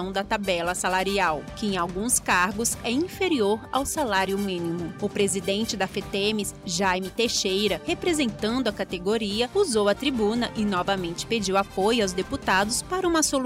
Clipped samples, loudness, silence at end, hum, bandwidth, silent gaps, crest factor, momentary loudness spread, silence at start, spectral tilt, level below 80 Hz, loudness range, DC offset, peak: under 0.1%; -25 LUFS; 0 s; none; 16 kHz; none; 14 dB; 6 LU; 0 s; -3 dB/octave; -48 dBFS; 2 LU; under 0.1%; -10 dBFS